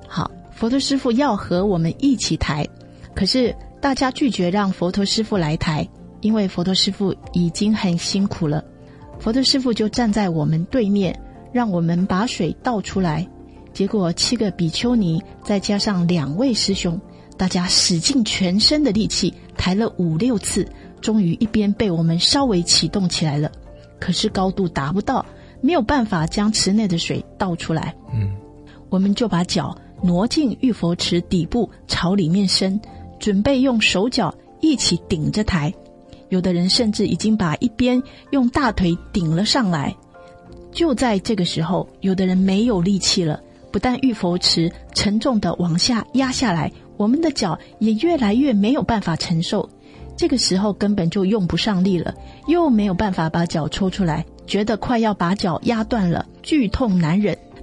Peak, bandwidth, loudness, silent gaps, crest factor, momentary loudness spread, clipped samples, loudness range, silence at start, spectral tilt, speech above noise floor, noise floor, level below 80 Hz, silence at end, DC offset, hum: -2 dBFS; 11.5 kHz; -19 LUFS; none; 18 dB; 8 LU; under 0.1%; 3 LU; 0 s; -5 dB/octave; 24 dB; -43 dBFS; -40 dBFS; 0 s; under 0.1%; none